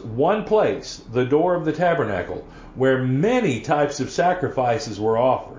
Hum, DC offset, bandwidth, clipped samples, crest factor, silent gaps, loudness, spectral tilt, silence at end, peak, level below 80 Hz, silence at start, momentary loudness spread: none; under 0.1%; 7.6 kHz; under 0.1%; 14 dB; none; -21 LUFS; -6 dB/octave; 0 s; -6 dBFS; -48 dBFS; 0 s; 8 LU